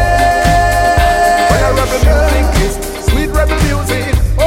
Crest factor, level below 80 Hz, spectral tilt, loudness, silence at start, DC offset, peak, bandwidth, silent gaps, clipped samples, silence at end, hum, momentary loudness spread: 10 dB; -14 dBFS; -5 dB/octave; -12 LUFS; 0 s; under 0.1%; 0 dBFS; 16.5 kHz; none; under 0.1%; 0 s; none; 5 LU